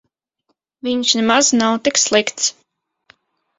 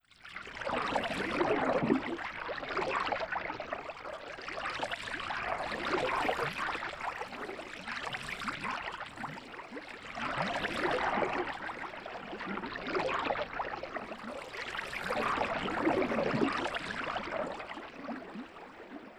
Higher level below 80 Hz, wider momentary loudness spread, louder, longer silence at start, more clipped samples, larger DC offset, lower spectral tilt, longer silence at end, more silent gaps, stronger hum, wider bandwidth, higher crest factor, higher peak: about the same, -60 dBFS vs -60 dBFS; second, 8 LU vs 12 LU; first, -15 LUFS vs -35 LUFS; first, 0.85 s vs 0.2 s; neither; neither; second, -1.5 dB/octave vs -4.5 dB/octave; first, 1.1 s vs 0 s; neither; neither; second, 8 kHz vs over 20 kHz; about the same, 20 dB vs 22 dB; first, 0 dBFS vs -14 dBFS